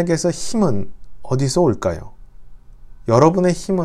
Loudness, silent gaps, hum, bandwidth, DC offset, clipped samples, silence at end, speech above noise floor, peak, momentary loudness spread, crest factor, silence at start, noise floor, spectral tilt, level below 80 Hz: -18 LUFS; none; none; 13 kHz; under 0.1%; under 0.1%; 0 s; 22 dB; 0 dBFS; 15 LU; 18 dB; 0 s; -38 dBFS; -6 dB/octave; -40 dBFS